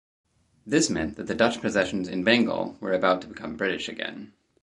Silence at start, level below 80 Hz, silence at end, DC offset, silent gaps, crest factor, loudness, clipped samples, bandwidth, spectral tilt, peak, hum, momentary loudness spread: 0.65 s; -56 dBFS; 0.35 s; under 0.1%; none; 22 dB; -25 LUFS; under 0.1%; 11.5 kHz; -4 dB/octave; -4 dBFS; none; 11 LU